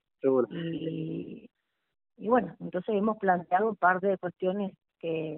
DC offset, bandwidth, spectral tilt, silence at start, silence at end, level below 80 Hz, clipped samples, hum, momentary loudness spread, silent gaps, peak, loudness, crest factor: under 0.1%; 4 kHz; -5.5 dB/octave; 0.25 s; 0 s; -72 dBFS; under 0.1%; none; 13 LU; none; -10 dBFS; -29 LUFS; 20 dB